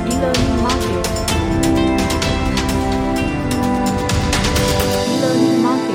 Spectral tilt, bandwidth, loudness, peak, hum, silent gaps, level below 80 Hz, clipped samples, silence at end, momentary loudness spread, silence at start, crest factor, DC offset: -5 dB/octave; 17 kHz; -17 LUFS; -2 dBFS; none; none; -26 dBFS; under 0.1%; 0 s; 3 LU; 0 s; 14 dB; under 0.1%